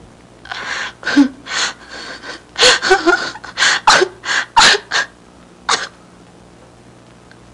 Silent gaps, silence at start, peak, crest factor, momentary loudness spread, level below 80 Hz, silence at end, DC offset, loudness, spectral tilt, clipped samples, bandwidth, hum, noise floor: none; 0.5 s; 0 dBFS; 16 dB; 19 LU; -48 dBFS; 1.65 s; under 0.1%; -13 LUFS; -1 dB/octave; under 0.1%; 11.5 kHz; none; -43 dBFS